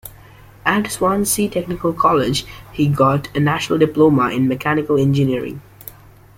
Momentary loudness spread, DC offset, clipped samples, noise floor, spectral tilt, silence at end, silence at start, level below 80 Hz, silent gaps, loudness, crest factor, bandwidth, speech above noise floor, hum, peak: 17 LU; under 0.1%; under 0.1%; -43 dBFS; -5.5 dB/octave; 0.75 s; 0.05 s; -44 dBFS; none; -17 LUFS; 16 dB; 17 kHz; 26 dB; none; -2 dBFS